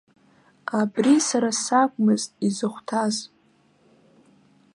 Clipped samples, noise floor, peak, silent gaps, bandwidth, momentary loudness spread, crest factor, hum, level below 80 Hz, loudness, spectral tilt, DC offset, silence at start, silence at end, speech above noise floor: under 0.1%; -61 dBFS; -6 dBFS; none; 11.5 kHz; 10 LU; 18 dB; none; -76 dBFS; -22 LUFS; -4 dB/octave; under 0.1%; 0.7 s; 1.5 s; 39 dB